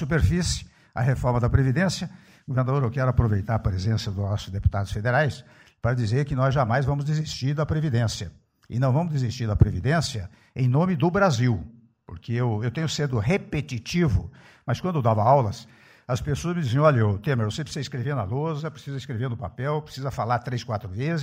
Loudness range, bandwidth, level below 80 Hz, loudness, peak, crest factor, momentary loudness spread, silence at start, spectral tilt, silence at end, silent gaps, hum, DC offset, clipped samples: 3 LU; 11 kHz; -40 dBFS; -25 LUFS; -6 dBFS; 18 dB; 11 LU; 0 s; -6.5 dB/octave; 0 s; none; none; under 0.1%; under 0.1%